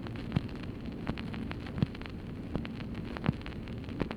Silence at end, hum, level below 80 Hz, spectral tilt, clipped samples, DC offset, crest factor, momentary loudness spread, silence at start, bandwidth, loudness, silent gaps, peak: 0 s; none; -46 dBFS; -8 dB/octave; under 0.1%; under 0.1%; 22 dB; 6 LU; 0 s; 12.5 kHz; -38 LUFS; none; -14 dBFS